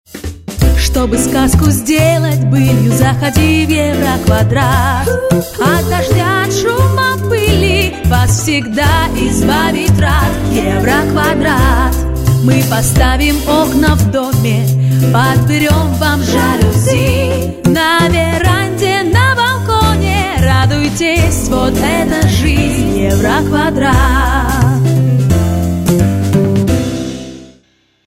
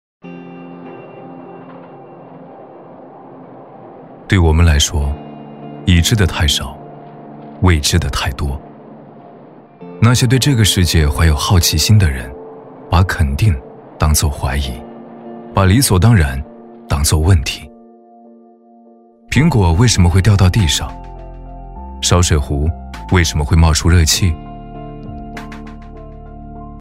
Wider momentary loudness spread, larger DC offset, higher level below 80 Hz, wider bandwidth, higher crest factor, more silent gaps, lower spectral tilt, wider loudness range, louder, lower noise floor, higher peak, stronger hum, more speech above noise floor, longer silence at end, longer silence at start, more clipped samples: second, 3 LU vs 23 LU; neither; about the same, -20 dBFS vs -24 dBFS; about the same, 16.5 kHz vs 16 kHz; second, 10 dB vs 16 dB; neither; about the same, -5.5 dB/octave vs -4.5 dB/octave; second, 1 LU vs 6 LU; first, -11 LUFS vs -14 LUFS; first, -52 dBFS vs -45 dBFS; about the same, 0 dBFS vs 0 dBFS; neither; first, 42 dB vs 33 dB; first, 0.6 s vs 0 s; about the same, 0.15 s vs 0.25 s; neither